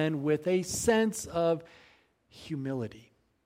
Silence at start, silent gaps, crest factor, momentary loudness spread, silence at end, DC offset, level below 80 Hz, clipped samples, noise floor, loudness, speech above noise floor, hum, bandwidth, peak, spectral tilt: 0 s; none; 18 dB; 13 LU; 0.45 s; under 0.1%; -60 dBFS; under 0.1%; -63 dBFS; -30 LUFS; 34 dB; none; 16 kHz; -14 dBFS; -5 dB/octave